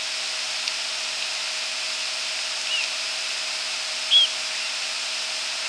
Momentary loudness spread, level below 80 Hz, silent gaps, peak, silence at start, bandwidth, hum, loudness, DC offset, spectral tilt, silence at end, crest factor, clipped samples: 8 LU; -86 dBFS; none; -6 dBFS; 0 s; 11 kHz; none; -23 LUFS; under 0.1%; 3.5 dB/octave; 0 s; 20 dB; under 0.1%